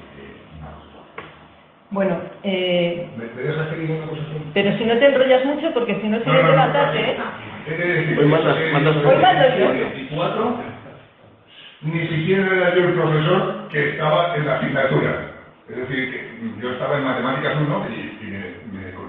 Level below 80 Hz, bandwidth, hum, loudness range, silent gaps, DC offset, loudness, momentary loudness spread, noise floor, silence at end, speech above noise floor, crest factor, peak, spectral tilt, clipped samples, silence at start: -56 dBFS; 4.3 kHz; none; 7 LU; none; under 0.1%; -19 LUFS; 17 LU; -49 dBFS; 0 s; 30 dB; 18 dB; -2 dBFS; -9.5 dB/octave; under 0.1%; 0 s